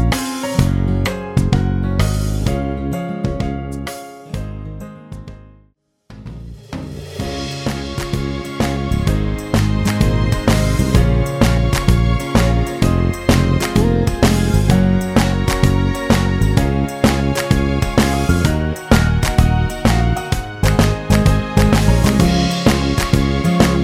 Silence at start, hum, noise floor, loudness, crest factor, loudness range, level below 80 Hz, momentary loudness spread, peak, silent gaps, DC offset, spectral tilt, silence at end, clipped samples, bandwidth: 0 s; none; -56 dBFS; -16 LUFS; 16 dB; 12 LU; -22 dBFS; 13 LU; 0 dBFS; none; under 0.1%; -6 dB/octave; 0 s; under 0.1%; 16.5 kHz